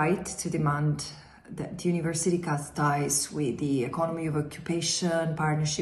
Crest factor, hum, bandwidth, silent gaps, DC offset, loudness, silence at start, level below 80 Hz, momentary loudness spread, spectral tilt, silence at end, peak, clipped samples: 16 dB; none; 12.5 kHz; none; under 0.1%; -28 LUFS; 0 s; -58 dBFS; 7 LU; -4.5 dB/octave; 0 s; -14 dBFS; under 0.1%